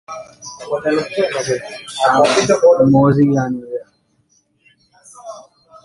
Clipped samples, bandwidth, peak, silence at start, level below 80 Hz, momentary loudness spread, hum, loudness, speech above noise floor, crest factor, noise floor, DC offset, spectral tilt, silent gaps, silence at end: under 0.1%; 11.5 kHz; -2 dBFS; 0.1 s; -52 dBFS; 22 LU; none; -15 LUFS; 46 dB; 16 dB; -60 dBFS; under 0.1%; -5.5 dB/octave; none; 0.45 s